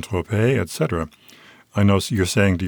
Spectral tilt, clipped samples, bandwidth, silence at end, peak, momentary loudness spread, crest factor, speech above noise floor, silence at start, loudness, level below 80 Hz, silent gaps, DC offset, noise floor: -6 dB/octave; under 0.1%; over 20 kHz; 0 s; -4 dBFS; 9 LU; 16 dB; 29 dB; 0 s; -21 LUFS; -44 dBFS; none; under 0.1%; -48 dBFS